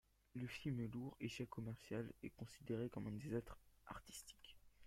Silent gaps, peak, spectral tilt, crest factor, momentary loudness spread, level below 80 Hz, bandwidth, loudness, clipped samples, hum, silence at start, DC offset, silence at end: none; -30 dBFS; -6 dB/octave; 20 dB; 13 LU; -70 dBFS; 16.5 kHz; -50 LUFS; under 0.1%; none; 0.35 s; under 0.1%; 0 s